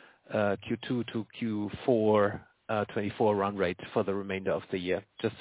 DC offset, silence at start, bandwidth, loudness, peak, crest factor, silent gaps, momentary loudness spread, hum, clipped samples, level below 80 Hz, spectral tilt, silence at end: under 0.1%; 0.3 s; 4 kHz; -31 LUFS; -12 dBFS; 18 dB; none; 8 LU; none; under 0.1%; -60 dBFS; -10.5 dB/octave; 0 s